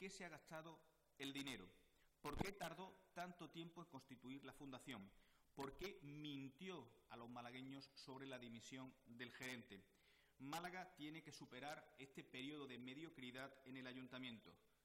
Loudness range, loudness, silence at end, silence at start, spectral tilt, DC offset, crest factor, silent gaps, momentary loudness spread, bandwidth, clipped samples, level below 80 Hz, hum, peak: 3 LU; -56 LUFS; 0.1 s; 0 s; -4.5 dB/octave; under 0.1%; 28 dB; none; 10 LU; 16 kHz; under 0.1%; -74 dBFS; none; -30 dBFS